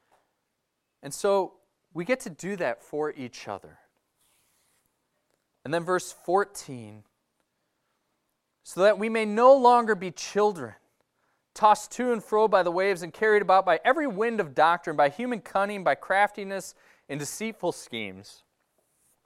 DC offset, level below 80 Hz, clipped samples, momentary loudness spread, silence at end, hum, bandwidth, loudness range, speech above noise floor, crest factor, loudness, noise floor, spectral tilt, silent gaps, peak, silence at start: under 0.1%; -72 dBFS; under 0.1%; 18 LU; 0.95 s; none; 14.5 kHz; 11 LU; 54 dB; 20 dB; -25 LUFS; -80 dBFS; -4.5 dB/octave; none; -6 dBFS; 1.05 s